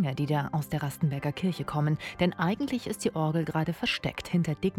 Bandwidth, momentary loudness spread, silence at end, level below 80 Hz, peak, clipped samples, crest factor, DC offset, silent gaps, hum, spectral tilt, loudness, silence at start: 16 kHz; 3 LU; 0 s; -56 dBFS; -12 dBFS; under 0.1%; 16 dB; under 0.1%; none; none; -6 dB/octave; -30 LUFS; 0 s